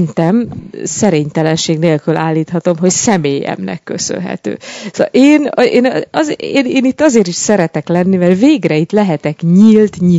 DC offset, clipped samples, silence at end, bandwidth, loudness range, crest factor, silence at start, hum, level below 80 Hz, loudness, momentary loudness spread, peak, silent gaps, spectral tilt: under 0.1%; 0.7%; 0 s; 8 kHz; 3 LU; 12 dB; 0 s; none; -50 dBFS; -12 LUFS; 11 LU; 0 dBFS; none; -5.5 dB/octave